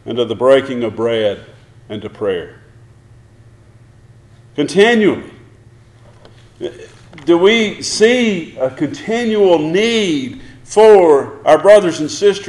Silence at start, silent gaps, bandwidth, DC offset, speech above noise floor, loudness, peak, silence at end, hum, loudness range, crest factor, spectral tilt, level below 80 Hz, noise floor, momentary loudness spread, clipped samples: 0.05 s; none; 11.5 kHz; under 0.1%; 31 dB; -13 LUFS; 0 dBFS; 0 s; none; 12 LU; 14 dB; -4.5 dB/octave; -50 dBFS; -44 dBFS; 20 LU; under 0.1%